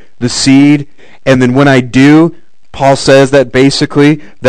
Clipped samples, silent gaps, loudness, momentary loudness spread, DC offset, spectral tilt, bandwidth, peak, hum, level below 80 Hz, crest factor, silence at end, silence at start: 7%; none; -7 LUFS; 7 LU; 3%; -5.5 dB/octave; 12 kHz; 0 dBFS; none; -38 dBFS; 8 dB; 0 s; 0.2 s